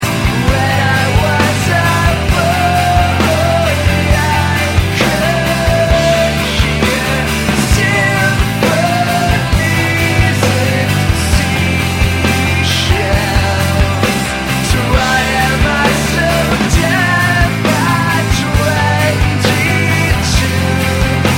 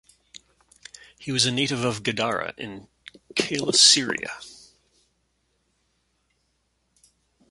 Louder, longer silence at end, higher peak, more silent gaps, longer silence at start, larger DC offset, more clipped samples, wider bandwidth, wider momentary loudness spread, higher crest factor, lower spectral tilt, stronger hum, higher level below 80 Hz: first, -12 LUFS vs -21 LUFS; second, 0 s vs 2.95 s; about the same, 0 dBFS vs -2 dBFS; neither; second, 0 s vs 1.2 s; neither; neither; first, 16.5 kHz vs 11.5 kHz; second, 2 LU vs 24 LU; second, 12 dB vs 26 dB; first, -5 dB/octave vs -2 dB/octave; neither; first, -22 dBFS vs -64 dBFS